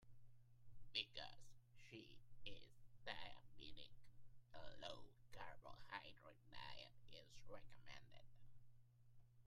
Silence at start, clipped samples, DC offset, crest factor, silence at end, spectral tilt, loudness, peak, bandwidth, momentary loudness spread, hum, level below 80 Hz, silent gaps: 0 s; under 0.1%; under 0.1%; 26 dB; 0 s; -3.5 dB/octave; -58 LUFS; -30 dBFS; 13 kHz; 14 LU; none; -72 dBFS; none